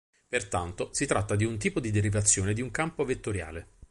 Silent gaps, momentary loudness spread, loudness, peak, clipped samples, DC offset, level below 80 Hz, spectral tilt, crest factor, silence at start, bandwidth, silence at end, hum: none; 10 LU; -29 LUFS; -8 dBFS; under 0.1%; under 0.1%; -46 dBFS; -4.5 dB/octave; 20 dB; 0.3 s; 11.5 kHz; 0.05 s; none